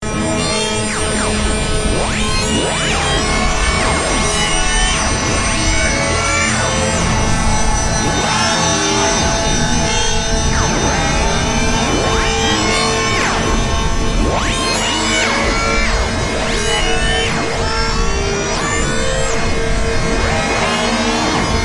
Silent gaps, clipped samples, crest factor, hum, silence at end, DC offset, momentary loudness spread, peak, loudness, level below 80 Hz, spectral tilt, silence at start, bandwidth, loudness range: none; under 0.1%; 14 dB; none; 0 s; under 0.1%; 4 LU; -2 dBFS; -15 LUFS; -22 dBFS; -3 dB/octave; 0 s; 11.5 kHz; 2 LU